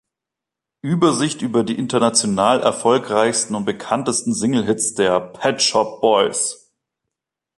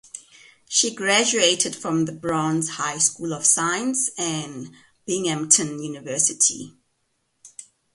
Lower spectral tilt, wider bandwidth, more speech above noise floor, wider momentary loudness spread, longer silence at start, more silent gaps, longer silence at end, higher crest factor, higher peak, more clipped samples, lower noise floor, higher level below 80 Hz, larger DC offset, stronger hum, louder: first, -3.5 dB/octave vs -2 dB/octave; about the same, 11.5 kHz vs 11.5 kHz; first, 67 dB vs 49 dB; second, 6 LU vs 18 LU; first, 0.85 s vs 0.15 s; neither; first, 1.05 s vs 0.3 s; second, 18 dB vs 24 dB; about the same, -2 dBFS vs 0 dBFS; neither; first, -85 dBFS vs -71 dBFS; first, -58 dBFS vs -66 dBFS; neither; neither; about the same, -18 LUFS vs -20 LUFS